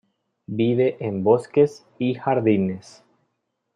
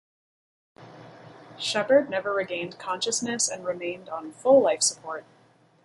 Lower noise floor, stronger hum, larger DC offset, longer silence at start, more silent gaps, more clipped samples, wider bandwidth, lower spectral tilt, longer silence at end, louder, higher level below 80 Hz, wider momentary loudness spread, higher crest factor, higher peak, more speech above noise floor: first, -75 dBFS vs -47 dBFS; neither; neither; second, 0.5 s vs 0.8 s; neither; neither; second, 10 kHz vs 11.5 kHz; first, -8 dB/octave vs -2 dB/octave; first, 0.95 s vs 0.65 s; first, -22 LUFS vs -25 LUFS; first, -68 dBFS vs -74 dBFS; second, 8 LU vs 16 LU; about the same, 18 dB vs 20 dB; first, -4 dBFS vs -8 dBFS; first, 54 dB vs 22 dB